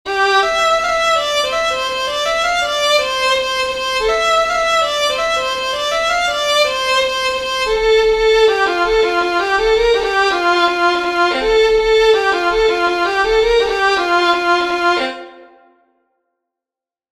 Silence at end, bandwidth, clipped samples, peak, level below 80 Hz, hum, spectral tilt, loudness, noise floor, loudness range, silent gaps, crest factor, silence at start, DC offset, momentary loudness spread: 1.65 s; 14 kHz; under 0.1%; -2 dBFS; -38 dBFS; none; -1.5 dB/octave; -14 LUFS; -89 dBFS; 2 LU; none; 14 dB; 0.05 s; under 0.1%; 5 LU